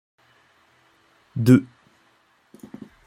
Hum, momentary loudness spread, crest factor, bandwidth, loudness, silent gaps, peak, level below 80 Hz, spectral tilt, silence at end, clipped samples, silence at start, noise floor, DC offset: none; 27 LU; 22 dB; 15.5 kHz; -18 LUFS; none; -2 dBFS; -60 dBFS; -8 dB/octave; 1.4 s; under 0.1%; 1.35 s; -62 dBFS; under 0.1%